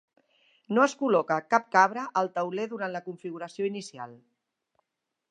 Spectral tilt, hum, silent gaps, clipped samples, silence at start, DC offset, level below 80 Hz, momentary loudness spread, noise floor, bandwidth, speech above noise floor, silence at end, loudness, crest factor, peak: -5 dB/octave; none; none; under 0.1%; 0.7 s; under 0.1%; -84 dBFS; 15 LU; -85 dBFS; 10.5 kHz; 57 dB; 1.15 s; -27 LUFS; 24 dB; -6 dBFS